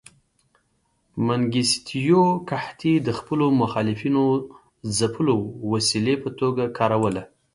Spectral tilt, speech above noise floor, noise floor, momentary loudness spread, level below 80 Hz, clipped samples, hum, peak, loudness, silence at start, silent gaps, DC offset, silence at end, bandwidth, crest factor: -5 dB/octave; 47 dB; -68 dBFS; 7 LU; -56 dBFS; under 0.1%; none; -6 dBFS; -22 LUFS; 1.15 s; none; under 0.1%; 0.3 s; 11.5 kHz; 18 dB